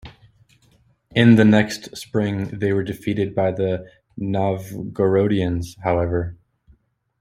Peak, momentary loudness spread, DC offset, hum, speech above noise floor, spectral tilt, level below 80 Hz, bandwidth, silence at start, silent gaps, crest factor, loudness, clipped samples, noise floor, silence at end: -2 dBFS; 15 LU; under 0.1%; none; 39 dB; -7 dB/octave; -50 dBFS; 15.5 kHz; 0.05 s; none; 20 dB; -20 LUFS; under 0.1%; -58 dBFS; 0.85 s